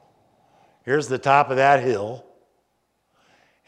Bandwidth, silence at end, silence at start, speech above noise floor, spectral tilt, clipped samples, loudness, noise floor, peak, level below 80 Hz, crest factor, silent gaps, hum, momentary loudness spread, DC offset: 10.5 kHz; 1.45 s; 0.85 s; 51 dB; -5.5 dB/octave; under 0.1%; -20 LUFS; -70 dBFS; -2 dBFS; -72 dBFS; 22 dB; none; none; 18 LU; under 0.1%